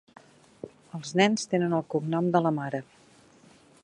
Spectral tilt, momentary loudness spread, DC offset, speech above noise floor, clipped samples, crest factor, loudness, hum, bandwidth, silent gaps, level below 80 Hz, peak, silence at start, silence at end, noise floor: -5.5 dB/octave; 20 LU; under 0.1%; 31 dB; under 0.1%; 22 dB; -27 LUFS; none; 11 kHz; none; -72 dBFS; -6 dBFS; 0.65 s; 1 s; -57 dBFS